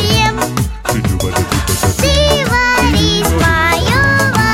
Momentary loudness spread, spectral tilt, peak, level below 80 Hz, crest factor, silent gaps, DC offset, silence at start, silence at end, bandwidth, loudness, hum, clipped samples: 6 LU; -4 dB/octave; 0 dBFS; -22 dBFS; 12 dB; none; 0.5%; 0 s; 0 s; 17 kHz; -12 LUFS; none; under 0.1%